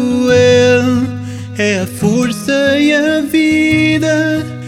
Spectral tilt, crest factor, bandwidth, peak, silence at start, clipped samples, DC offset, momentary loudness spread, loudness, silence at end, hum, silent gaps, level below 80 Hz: -5.5 dB/octave; 12 dB; 15.5 kHz; 0 dBFS; 0 s; under 0.1%; under 0.1%; 8 LU; -12 LUFS; 0 s; none; none; -48 dBFS